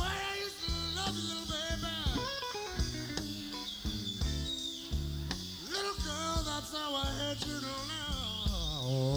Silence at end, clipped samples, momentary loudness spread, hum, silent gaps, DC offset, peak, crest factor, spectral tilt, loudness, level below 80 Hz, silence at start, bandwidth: 0 s; under 0.1%; 4 LU; none; none; under 0.1%; -18 dBFS; 18 dB; -4 dB/octave; -36 LUFS; -42 dBFS; 0 s; over 20 kHz